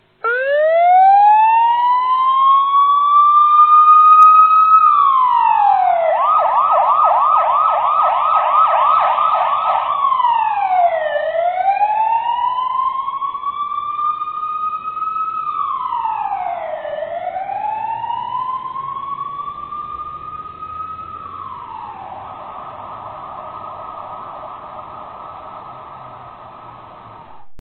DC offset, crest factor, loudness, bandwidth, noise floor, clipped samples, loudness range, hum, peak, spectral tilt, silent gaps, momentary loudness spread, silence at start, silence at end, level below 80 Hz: under 0.1%; 14 dB; -14 LUFS; 4.4 kHz; -37 dBFS; under 0.1%; 22 LU; none; 0 dBFS; -5 dB/octave; none; 22 LU; 0.25 s; 0 s; -58 dBFS